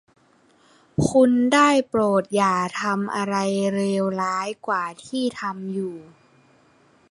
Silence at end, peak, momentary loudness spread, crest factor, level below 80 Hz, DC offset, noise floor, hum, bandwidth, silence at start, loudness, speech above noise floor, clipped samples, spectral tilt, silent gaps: 1.1 s; -4 dBFS; 12 LU; 18 dB; -54 dBFS; under 0.1%; -58 dBFS; none; 11.5 kHz; 1 s; -22 LUFS; 37 dB; under 0.1%; -5.5 dB/octave; none